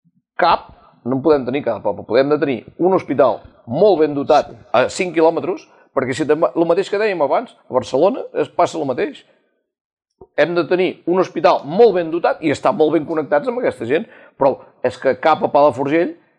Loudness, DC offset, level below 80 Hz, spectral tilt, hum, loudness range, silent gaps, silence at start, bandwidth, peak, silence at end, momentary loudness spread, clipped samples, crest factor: -17 LUFS; under 0.1%; -56 dBFS; -6 dB/octave; none; 4 LU; 9.81-9.97 s; 0.4 s; 10 kHz; -2 dBFS; 0.25 s; 9 LU; under 0.1%; 16 dB